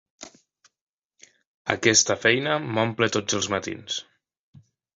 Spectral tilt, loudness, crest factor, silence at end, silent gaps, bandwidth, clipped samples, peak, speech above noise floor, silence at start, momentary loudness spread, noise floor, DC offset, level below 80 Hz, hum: -2.5 dB/octave; -23 LUFS; 24 dB; 0.95 s; 0.81-1.10 s, 1.47-1.65 s; 7.8 kHz; under 0.1%; -2 dBFS; 38 dB; 0.2 s; 13 LU; -61 dBFS; under 0.1%; -60 dBFS; none